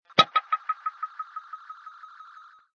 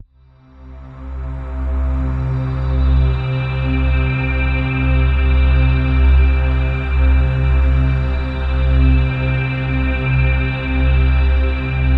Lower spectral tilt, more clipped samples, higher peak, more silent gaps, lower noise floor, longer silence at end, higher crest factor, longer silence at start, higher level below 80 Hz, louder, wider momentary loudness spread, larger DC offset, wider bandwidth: second, -3 dB/octave vs -9 dB/octave; neither; about the same, 0 dBFS vs -2 dBFS; neither; first, -51 dBFS vs -47 dBFS; first, 0.7 s vs 0 s; first, 30 dB vs 12 dB; second, 0.15 s vs 0.6 s; second, -76 dBFS vs -16 dBFS; second, -27 LUFS vs -17 LUFS; first, 25 LU vs 6 LU; neither; first, 7.4 kHz vs 4.2 kHz